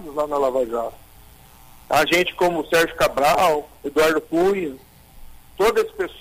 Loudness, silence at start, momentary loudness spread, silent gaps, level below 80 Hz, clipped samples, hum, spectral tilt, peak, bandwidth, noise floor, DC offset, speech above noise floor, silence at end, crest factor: -20 LUFS; 0 s; 8 LU; none; -46 dBFS; under 0.1%; none; -3.5 dB/octave; -6 dBFS; 16 kHz; -47 dBFS; under 0.1%; 27 dB; 0 s; 14 dB